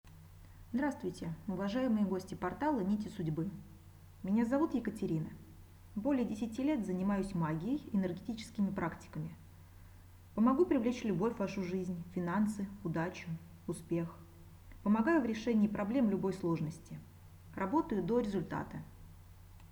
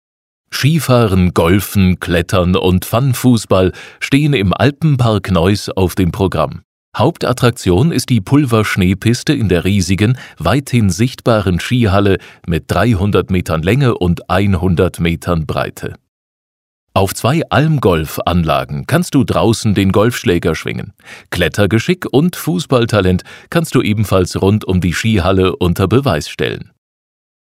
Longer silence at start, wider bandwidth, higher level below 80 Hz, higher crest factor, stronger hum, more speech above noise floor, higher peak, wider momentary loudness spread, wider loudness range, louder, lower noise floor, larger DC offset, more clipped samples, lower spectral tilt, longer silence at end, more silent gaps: second, 0.05 s vs 0.5 s; first, over 20 kHz vs 16 kHz; second, -60 dBFS vs -34 dBFS; about the same, 18 dB vs 14 dB; neither; second, 21 dB vs over 77 dB; second, -18 dBFS vs 0 dBFS; first, 13 LU vs 6 LU; about the same, 3 LU vs 3 LU; second, -36 LUFS vs -14 LUFS; second, -56 dBFS vs under -90 dBFS; neither; neither; first, -7.5 dB/octave vs -6 dB/octave; second, 0.05 s vs 0.95 s; second, none vs 6.64-6.92 s, 16.08-16.87 s